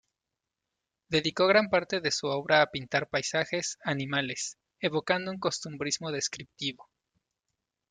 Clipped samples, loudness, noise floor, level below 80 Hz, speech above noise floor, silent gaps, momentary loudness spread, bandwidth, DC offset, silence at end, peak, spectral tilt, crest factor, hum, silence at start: under 0.1%; -29 LUFS; -88 dBFS; -68 dBFS; 58 dB; none; 10 LU; 9.6 kHz; under 0.1%; 1.1 s; -8 dBFS; -3 dB/octave; 22 dB; none; 1.1 s